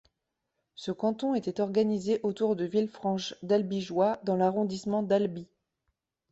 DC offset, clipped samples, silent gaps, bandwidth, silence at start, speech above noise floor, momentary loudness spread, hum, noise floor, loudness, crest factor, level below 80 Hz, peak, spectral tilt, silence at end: under 0.1%; under 0.1%; none; 8 kHz; 0.8 s; 55 dB; 5 LU; none; -83 dBFS; -29 LUFS; 18 dB; -70 dBFS; -12 dBFS; -6.5 dB/octave; 0.9 s